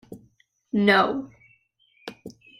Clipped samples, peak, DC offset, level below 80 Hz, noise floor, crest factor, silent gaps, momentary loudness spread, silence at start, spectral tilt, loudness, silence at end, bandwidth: under 0.1%; -6 dBFS; under 0.1%; -66 dBFS; -64 dBFS; 22 dB; none; 25 LU; 0.1 s; -6 dB/octave; -22 LUFS; 0.3 s; 15 kHz